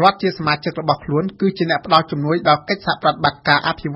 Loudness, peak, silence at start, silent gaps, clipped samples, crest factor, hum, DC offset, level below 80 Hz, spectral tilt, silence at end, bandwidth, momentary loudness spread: -18 LUFS; 0 dBFS; 0 s; none; under 0.1%; 18 dB; none; under 0.1%; -50 dBFS; -7.5 dB/octave; 0 s; 6 kHz; 5 LU